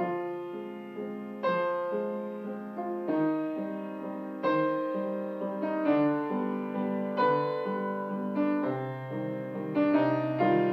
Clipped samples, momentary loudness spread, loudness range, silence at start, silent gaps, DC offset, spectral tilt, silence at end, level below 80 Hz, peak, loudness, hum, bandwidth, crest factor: under 0.1%; 11 LU; 3 LU; 0 s; none; under 0.1%; -9 dB/octave; 0 s; -82 dBFS; -14 dBFS; -31 LUFS; none; 5.8 kHz; 16 dB